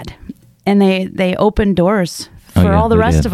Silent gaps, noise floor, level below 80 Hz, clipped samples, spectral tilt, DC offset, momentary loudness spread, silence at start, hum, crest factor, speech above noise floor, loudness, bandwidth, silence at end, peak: none; -35 dBFS; -28 dBFS; under 0.1%; -7 dB/octave; under 0.1%; 10 LU; 0 s; none; 12 dB; 23 dB; -14 LUFS; 14.5 kHz; 0 s; -2 dBFS